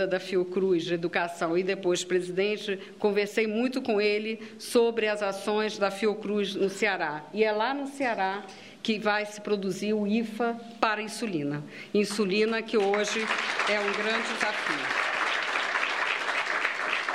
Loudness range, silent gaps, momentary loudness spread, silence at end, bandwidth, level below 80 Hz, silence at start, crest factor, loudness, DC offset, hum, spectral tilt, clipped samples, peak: 3 LU; none; 5 LU; 0 s; 14.5 kHz; -80 dBFS; 0 s; 22 dB; -28 LUFS; under 0.1%; none; -4 dB/octave; under 0.1%; -6 dBFS